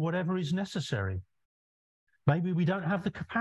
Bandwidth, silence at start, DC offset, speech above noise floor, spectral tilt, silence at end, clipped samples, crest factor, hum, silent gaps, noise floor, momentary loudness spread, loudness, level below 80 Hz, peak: 11.5 kHz; 0 s; under 0.1%; over 60 dB; -7 dB/octave; 0 s; under 0.1%; 22 dB; none; 1.45-2.07 s; under -90 dBFS; 5 LU; -31 LUFS; -54 dBFS; -10 dBFS